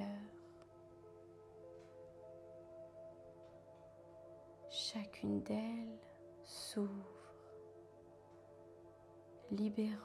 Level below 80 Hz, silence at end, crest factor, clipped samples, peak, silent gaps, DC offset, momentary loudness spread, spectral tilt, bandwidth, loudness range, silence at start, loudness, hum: -78 dBFS; 0 s; 18 dB; under 0.1%; -30 dBFS; none; under 0.1%; 19 LU; -5 dB/octave; 13.5 kHz; 13 LU; 0 s; -46 LUFS; none